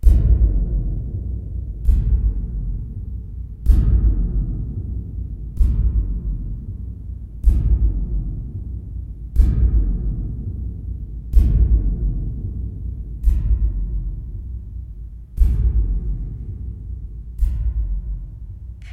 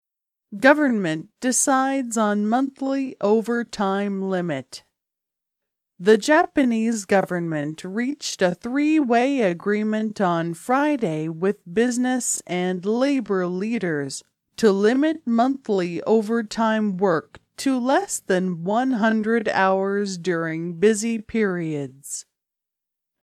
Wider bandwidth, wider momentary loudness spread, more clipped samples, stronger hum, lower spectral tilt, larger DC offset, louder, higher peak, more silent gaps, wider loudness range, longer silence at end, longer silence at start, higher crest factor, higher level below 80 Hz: second, 1.5 kHz vs 14.5 kHz; first, 14 LU vs 8 LU; neither; neither; first, -10 dB/octave vs -4.5 dB/octave; neither; about the same, -23 LUFS vs -22 LUFS; about the same, 0 dBFS vs -2 dBFS; neither; about the same, 4 LU vs 3 LU; second, 0 s vs 1.05 s; second, 0 s vs 0.5 s; about the same, 18 dB vs 20 dB; first, -20 dBFS vs -64 dBFS